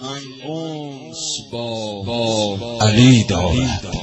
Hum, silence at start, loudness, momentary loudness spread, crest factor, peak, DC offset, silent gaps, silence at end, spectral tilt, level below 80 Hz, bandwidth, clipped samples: none; 0 s; -18 LUFS; 17 LU; 18 dB; -2 dBFS; under 0.1%; none; 0 s; -5 dB/octave; -36 dBFS; 8.4 kHz; under 0.1%